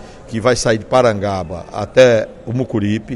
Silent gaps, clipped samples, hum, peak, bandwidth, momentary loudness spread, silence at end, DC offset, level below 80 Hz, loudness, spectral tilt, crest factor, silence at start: none; under 0.1%; none; 0 dBFS; 11.5 kHz; 13 LU; 0 s; under 0.1%; -42 dBFS; -15 LUFS; -5.5 dB/octave; 16 dB; 0 s